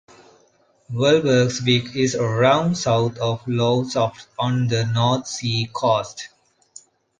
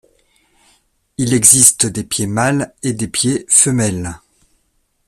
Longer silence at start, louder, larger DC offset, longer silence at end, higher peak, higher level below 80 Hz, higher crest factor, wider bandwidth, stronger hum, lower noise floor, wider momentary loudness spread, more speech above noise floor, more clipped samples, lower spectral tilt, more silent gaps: second, 0.9 s vs 1.2 s; second, -20 LUFS vs -12 LUFS; neither; about the same, 0.95 s vs 0.9 s; about the same, -2 dBFS vs 0 dBFS; second, -56 dBFS vs -48 dBFS; about the same, 18 dB vs 16 dB; second, 9.6 kHz vs over 20 kHz; neither; second, -59 dBFS vs -63 dBFS; second, 8 LU vs 14 LU; second, 40 dB vs 49 dB; second, under 0.1% vs 0.1%; first, -5.5 dB/octave vs -3 dB/octave; neither